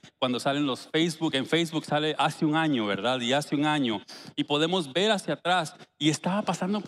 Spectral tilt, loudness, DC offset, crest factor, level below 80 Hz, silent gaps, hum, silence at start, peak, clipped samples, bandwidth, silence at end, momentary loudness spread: -4.5 dB/octave; -27 LUFS; under 0.1%; 18 dB; -78 dBFS; none; none; 0.05 s; -10 dBFS; under 0.1%; 13.5 kHz; 0 s; 4 LU